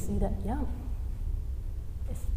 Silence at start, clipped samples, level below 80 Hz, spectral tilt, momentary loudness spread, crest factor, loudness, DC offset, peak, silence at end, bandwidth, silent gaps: 0 s; under 0.1%; -34 dBFS; -8 dB/octave; 7 LU; 16 dB; -36 LUFS; under 0.1%; -16 dBFS; 0 s; 15.5 kHz; none